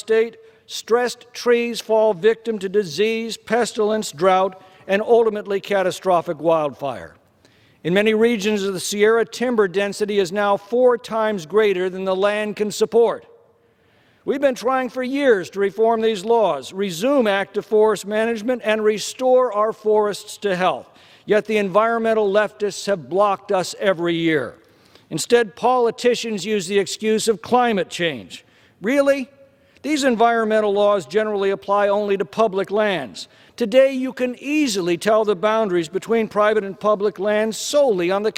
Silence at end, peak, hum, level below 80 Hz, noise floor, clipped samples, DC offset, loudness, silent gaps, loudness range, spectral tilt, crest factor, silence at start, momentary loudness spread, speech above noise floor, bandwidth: 0.05 s; -2 dBFS; none; -64 dBFS; -58 dBFS; under 0.1%; under 0.1%; -19 LUFS; none; 2 LU; -4.5 dB/octave; 18 dB; 0.05 s; 8 LU; 39 dB; 16 kHz